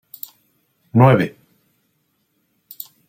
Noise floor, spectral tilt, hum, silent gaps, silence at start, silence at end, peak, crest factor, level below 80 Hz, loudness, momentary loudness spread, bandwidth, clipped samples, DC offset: -67 dBFS; -8.5 dB/octave; none; none; 0.95 s; 1.8 s; -2 dBFS; 20 dB; -58 dBFS; -16 LUFS; 22 LU; 16.5 kHz; under 0.1%; under 0.1%